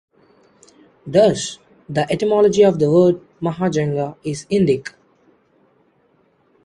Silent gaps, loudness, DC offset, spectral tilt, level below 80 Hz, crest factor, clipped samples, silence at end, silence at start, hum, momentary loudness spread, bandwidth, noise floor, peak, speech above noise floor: none; -18 LUFS; under 0.1%; -6 dB/octave; -56 dBFS; 18 dB; under 0.1%; 1.75 s; 1.05 s; none; 14 LU; 11.5 kHz; -59 dBFS; -2 dBFS; 43 dB